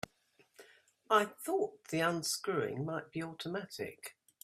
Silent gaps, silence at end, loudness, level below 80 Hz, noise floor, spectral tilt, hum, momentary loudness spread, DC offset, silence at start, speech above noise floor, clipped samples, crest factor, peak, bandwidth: none; 0.3 s; -36 LUFS; -78 dBFS; -71 dBFS; -4 dB/octave; none; 13 LU; under 0.1%; 0.6 s; 35 dB; under 0.1%; 24 dB; -14 dBFS; 16 kHz